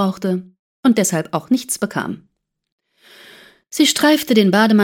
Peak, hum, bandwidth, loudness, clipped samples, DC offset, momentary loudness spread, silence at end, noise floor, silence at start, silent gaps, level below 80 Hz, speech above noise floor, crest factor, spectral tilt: -2 dBFS; none; 17.5 kHz; -17 LUFS; under 0.1%; under 0.1%; 13 LU; 0 s; -46 dBFS; 0 s; 0.59-0.83 s, 2.72-2.78 s; -62 dBFS; 31 dB; 16 dB; -4 dB/octave